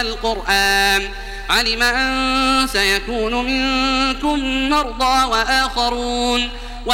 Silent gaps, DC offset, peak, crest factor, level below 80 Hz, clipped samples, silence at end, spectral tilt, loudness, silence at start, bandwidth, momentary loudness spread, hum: none; under 0.1%; -2 dBFS; 16 dB; -30 dBFS; under 0.1%; 0 s; -2 dB/octave; -17 LUFS; 0 s; 16.5 kHz; 6 LU; none